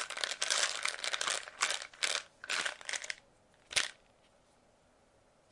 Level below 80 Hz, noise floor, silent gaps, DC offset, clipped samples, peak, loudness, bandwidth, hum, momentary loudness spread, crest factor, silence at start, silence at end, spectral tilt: -76 dBFS; -68 dBFS; none; under 0.1%; under 0.1%; -8 dBFS; -35 LUFS; 11.5 kHz; none; 9 LU; 30 dB; 0 s; 1.6 s; 2 dB/octave